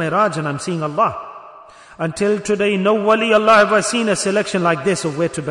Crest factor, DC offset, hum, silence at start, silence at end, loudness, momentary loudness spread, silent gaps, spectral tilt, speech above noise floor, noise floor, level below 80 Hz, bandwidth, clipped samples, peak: 16 dB; under 0.1%; none; 0 s; 0 s; -17 LUFS; 11 LU; none; -4.5 dB/octave; 25 dB; -41 dBFS; -56 dBFS; 11 kHz; under 0.1%; -2 dBFS